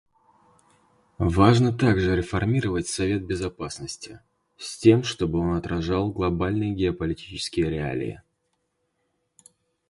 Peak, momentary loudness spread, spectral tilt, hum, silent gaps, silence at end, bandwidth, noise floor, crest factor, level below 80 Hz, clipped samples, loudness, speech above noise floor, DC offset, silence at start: -4 dBFS; 15 LU; -6 dB/octave; none; none; 1.7 s; 11.5 kHz; -74 dBFS; 22 dB; -42 dBFS; under 0.1%; -24 LUFS; 51 dB; under 0.1%; 1.2 s